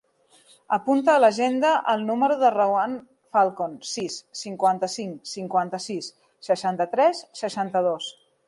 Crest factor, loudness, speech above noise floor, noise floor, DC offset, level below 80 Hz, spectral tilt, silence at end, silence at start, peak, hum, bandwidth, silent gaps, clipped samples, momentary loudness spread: 18 dB; -23 LUFS; 35 dB; -58 dBFS; under 0.1%; -76 dBFS; -4 dB/octave; 0.35 s; 0.7 s; -6 dBFS; none; 11.5 kHz; none; under 0.1%; 13 LU